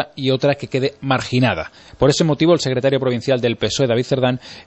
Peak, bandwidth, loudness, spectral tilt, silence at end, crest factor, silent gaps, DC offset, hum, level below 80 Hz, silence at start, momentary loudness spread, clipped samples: -2 dBFS; 8.4 kHz; -18 LUFS; -5.5 dB/octave; 0.05 s; 16 dB; none; under 0.1%; none; -46 dBFS; 0 s; 5 LU; under 0.1%